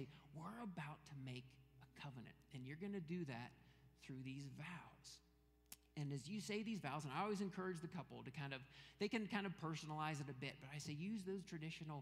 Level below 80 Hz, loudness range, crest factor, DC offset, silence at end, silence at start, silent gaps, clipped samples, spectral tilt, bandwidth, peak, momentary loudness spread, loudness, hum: -78 dBFS; 6 LU; 22 dB; under 0.1%; 0 s; 0 s; none; under 0.1%; -5.5 dB/octave; 15.5 kHz; -28 dBFS; 15 LU; -50 LUFS; none